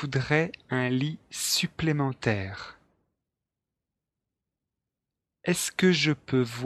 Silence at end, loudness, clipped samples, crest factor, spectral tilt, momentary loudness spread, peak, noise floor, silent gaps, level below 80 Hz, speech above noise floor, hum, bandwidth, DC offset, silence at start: 0 s; -27 LUFS; under 0.1%; 22 dB; -4.5 dB/octave; 10 LU; -8 dBFS; -87 dBFS; none; -60 dBFS; 60 dB; none; 13 kHz; under 0.1%; 0 s